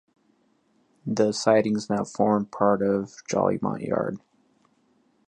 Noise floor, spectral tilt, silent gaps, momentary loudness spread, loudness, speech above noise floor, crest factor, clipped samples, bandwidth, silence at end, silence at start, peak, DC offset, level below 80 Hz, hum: -66 dBFS; -6 dB/octave; none; 9 LU; -25 LUFS; 42 dB; 22 dB; under 0.1%; 9.8 kHz; 1.1 s; 1.05 s; -4 dBFS; under 0.1%; -64 dBFS; none